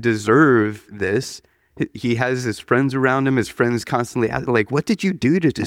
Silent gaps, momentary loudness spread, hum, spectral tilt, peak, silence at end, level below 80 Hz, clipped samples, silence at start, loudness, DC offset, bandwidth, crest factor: none; 10 LU; none; -6.5 dB/octave; -2 dBFS; 0 s; -52 dBFS; under 0.1%; 0 s; -19 LUFS; under 0.1%; 16 kHz; 16 dB